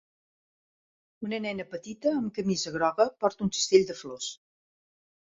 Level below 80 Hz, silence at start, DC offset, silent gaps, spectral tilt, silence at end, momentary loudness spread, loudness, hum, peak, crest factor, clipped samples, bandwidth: -68 dBFS; 1.2 s; under 0.1%; none; -4 dB/octave; 1 s; 14 LU; -28 LUFS; none; -8 dBFS; 22 dB; under 0.1%; 8 kHz